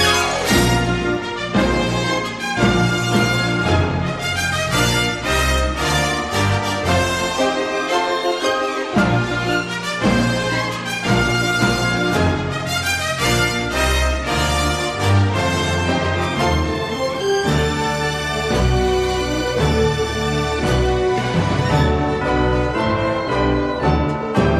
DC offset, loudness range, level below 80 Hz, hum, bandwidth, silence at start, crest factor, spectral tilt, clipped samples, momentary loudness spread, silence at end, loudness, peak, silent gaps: under 0.1%; 1 LU; -28 dBFS; none; 14 kHz; 0 s; 14 dB; -4.5 dB/octave; under 0.1%; 4 LU; 0 s; -18 LUFS; -4 dBFS; none